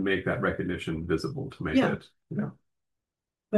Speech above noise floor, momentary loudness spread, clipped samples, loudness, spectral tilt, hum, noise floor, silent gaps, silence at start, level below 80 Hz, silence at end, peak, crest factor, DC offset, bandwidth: 60 dB; 10 LU; under 0.1%; -30 LUFS; -7 dB/octave; none; -89 dBFS; none; 0 s; -56 dBFS; 0 s; -12 dBFS; 18 dB; under 0.1%; 12.5 kHz